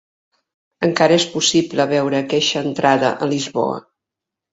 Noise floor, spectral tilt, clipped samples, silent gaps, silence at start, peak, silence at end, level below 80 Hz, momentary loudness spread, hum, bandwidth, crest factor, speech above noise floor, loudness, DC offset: -84 dBFS; -4 dB/octave; under 0.1%; none; 0.8 s; 0 dBFS; 0.75 s; -60 dBFS; 7 LU; none; 8 kHz; 18 dB; 67 dB; -17 LUFS; under 0.1%